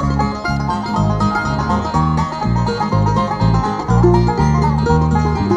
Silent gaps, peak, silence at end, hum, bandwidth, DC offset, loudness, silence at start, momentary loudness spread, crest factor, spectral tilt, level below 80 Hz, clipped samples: none; 0 dBFS; 0 s; none; 9.6 kHz; under 0.1%; -16 LUFS; 0 s; 5 LU; 14 dB; -7.5 dB/octave; -26 dBFS; under 0.1%